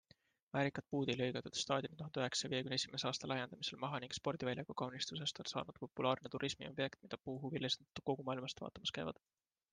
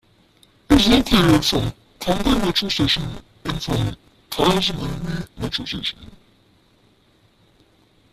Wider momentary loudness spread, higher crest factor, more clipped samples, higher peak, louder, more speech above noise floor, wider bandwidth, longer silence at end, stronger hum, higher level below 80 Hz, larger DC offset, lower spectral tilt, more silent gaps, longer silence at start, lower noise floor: second, 7 LU vs 14 LU; about the same, 22 dB vs 18 dB; neither; second, -20 dBFS vs -2 dBFS; second, -42 LUFS vs -20 LUFS; second, 30 dB vs 38 dB; second, 10 kHz vs 15 kHz; second, 0.6 s vs 2.05 s; neither; second, -76 dBFS vs -34 dBFS; neither; about the same, -4 dB/octave vs -5 dB/octave; neither; second, 0.55 s vs 0.7 s; first, -73 dBFS vs -58 dBFS